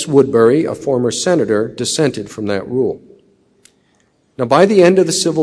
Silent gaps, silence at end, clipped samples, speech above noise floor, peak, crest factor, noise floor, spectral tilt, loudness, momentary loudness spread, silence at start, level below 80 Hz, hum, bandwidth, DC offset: none; 0 s; under 0.1%; 44 dB; 0 dBFS; 14 dB; -58 dBFS; -5 dB/octave; -14 LUFS; 11 LU; 0 s; -56 dBFS; none; 11 kHz; under 0.1%